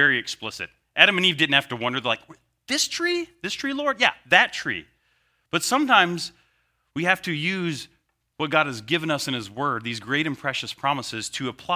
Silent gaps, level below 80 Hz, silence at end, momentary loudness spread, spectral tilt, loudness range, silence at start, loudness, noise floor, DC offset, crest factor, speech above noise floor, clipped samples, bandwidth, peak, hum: none; -64 dBFS; 0 s; 13 LU; -3 dB/octave; 4 LU; 0 s; -23 LUFS; -69 dBFS; under 0.1%; 24 dB; 45 dB; under 0.1%; 16 kHz; 0 dBFS; none